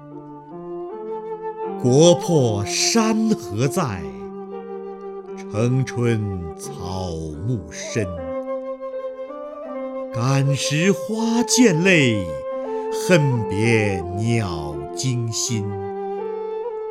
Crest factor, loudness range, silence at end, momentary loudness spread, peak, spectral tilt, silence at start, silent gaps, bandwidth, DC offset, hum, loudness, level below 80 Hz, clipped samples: 20 dB; 8 LU; 0 s; 17 LU; -2 dBFS; -5 dB/octave; 0 s; none; 16 kHz; under 0.1%; none; -21 LUFS; -50 dBFS; under 0.1%